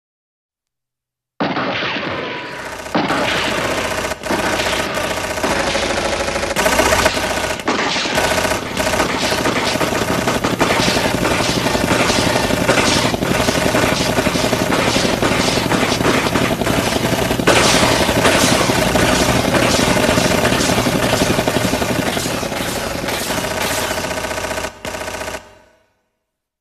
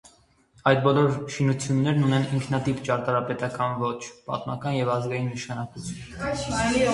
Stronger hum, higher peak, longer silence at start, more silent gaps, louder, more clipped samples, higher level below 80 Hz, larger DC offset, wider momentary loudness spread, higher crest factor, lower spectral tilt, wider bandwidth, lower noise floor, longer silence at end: neither; first, 0 dBFS vs -4 dBFS; first, 1.4 s vs 0.65 s; neither; first, -16 LUFS vs -25 LUFS; neither; first, -34 dBFS vs -50 dBFS; neither; second, 8 LU vs 11 LU; about the same, 18 dB vs 20 dB; second, -3.5 dB/octave vs -6 dB/octave; first, 14 kHz vs 11.5 kHz; first, -83 dBFS vs -59 dBFS; first, 1.15 s vs 0 s